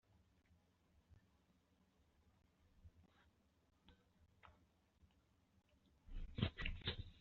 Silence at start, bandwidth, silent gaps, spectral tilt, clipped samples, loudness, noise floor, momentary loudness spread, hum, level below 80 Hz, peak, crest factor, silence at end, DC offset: 1.1 s; 7.2 kHz; none; -4 dB/octave; under 0.1%; -47 LUFS; -79 dBFS; 14 LU; none; -60 dBFS; -24 dBFS; 30 dB; 0 s; under 0.1%